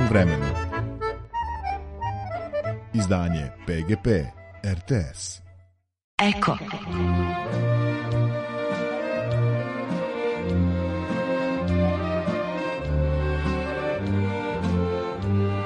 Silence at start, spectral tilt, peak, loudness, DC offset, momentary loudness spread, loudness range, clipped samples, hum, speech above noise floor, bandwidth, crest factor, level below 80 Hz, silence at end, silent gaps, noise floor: 0 s; -7 dB/octave; -6 dBFS; -26 LUFS; under 0.1%; 7 LU; 2 LU; under 0.1%; none; 32 dB; 10.5 kHz; 20 dB; -38 dBFS; 0 s; 6.04-6.18 s; -56 dBFS